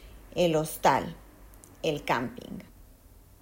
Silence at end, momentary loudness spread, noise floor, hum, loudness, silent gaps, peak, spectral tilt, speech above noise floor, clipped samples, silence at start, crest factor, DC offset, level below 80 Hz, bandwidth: 0.6 s; 18 LU; -54 dBFS; none; -28 LUFS; none; -10 dBFS; -5 dB/octave; 26 dB; under 0.1%; 0 s; 22 dB; under 0.1%; -54 dBFS; 16.5 kHz